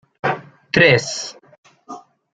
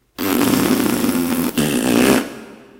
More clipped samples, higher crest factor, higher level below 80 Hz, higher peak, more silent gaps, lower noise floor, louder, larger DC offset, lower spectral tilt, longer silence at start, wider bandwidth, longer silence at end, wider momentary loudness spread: neither; about the same, 20 dB vs 18 dB; second, -54 dBFS vs -46 dBFS; about the same, 0 dBFS vs 0 dBFS; first, 1.58-1.63 s vs none; about the same, -39 dBFS vs -37 dBFS; about the same, -17 LUFS vs -17 LUFS; neither; about the same, -4 dB/octave vs -4 dB/octave; about the same, 0.25 s vs 0.2 s; second, 9.2 kHz vs 17.5 kHz; about the same, 0.35 s vs 0.25 s; first, 25 LU vs 6 LU